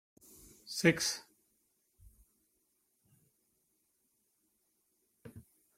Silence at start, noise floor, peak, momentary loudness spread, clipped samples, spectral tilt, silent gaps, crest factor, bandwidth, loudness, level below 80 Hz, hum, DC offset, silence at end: 0.65 s; -78 dBFS; -12 dBFS; 26 LU; under 0.1%; -3.5 dB/octave; none; 30 dB; 16.5 kHz; -32 LUFS; -72 dBFS; none; under 0.1%; 0.35 s